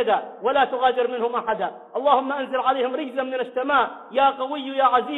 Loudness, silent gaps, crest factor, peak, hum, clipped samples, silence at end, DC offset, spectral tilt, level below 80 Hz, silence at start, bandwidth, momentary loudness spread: -22 LUFS; none; 18 dB; -4 dBFS; none; under 0.1%; 0 s; under 0.1%; -6 dB/octave; -68 dBFS; 0 s; 4.1 kHz; 7 LU